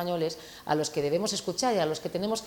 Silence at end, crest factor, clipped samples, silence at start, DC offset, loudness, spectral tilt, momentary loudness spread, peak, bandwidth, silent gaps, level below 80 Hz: 0 s; 16 dB; under 0.1%; 0 s; under 0.1%; -29 LUFS; -4 dB/octave; 5 LU; -12 dBFS; 18 kHz; none; -62 dBFS